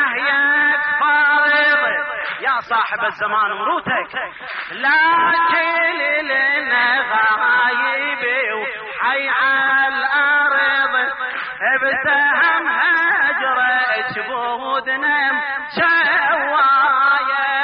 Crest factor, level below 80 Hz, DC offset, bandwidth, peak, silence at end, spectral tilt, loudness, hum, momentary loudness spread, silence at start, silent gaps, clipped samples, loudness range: 12 dB; -62 dBFS; under 0.1%; 5.2 kHz; -6 dBFS; 0 s; 1.5 dB/octave; -16 LUFS; none; 8 LU; 0 s; none; under 0.1%; 2 LU